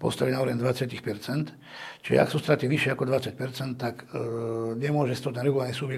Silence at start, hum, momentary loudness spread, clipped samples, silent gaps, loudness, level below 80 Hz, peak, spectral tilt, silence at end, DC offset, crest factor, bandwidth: 0 s; none; 10 LU; under 0.1%; none; -28 LUFS; -64 dBFS; -6 dBFS; -6.5 dB/octave; 0 s; under 0.1%; 20 dB; 15 kHz